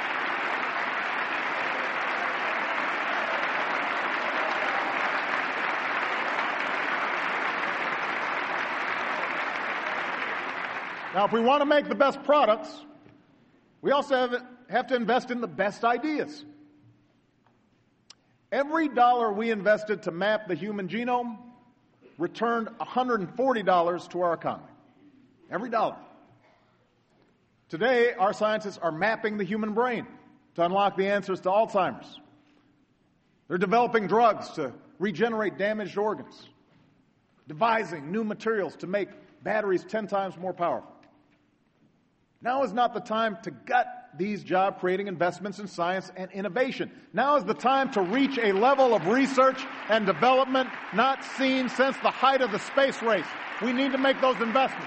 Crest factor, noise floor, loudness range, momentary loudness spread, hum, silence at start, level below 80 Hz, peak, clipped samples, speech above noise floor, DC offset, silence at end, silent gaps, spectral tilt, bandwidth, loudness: 20 dB; -67 dBFS; 7 LU; 10 LU; none; 0 s; -74 dBFS; -8 dBFS; under 0.1%; 41 dB; under 0.1%; 0 s; none; -5 dB/octave; 8.4 kHz; -27 LUFS